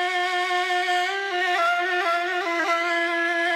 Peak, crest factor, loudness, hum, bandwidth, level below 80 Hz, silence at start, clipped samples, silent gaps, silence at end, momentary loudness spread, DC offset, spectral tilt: -10 dBFS; 12 dB; -22 LUFS; none; 15.5 kHz; under -90 dBFS; 0 s; under 0.1%; none; 0 s; 2 LU; under 0.1%; 0 dB/octave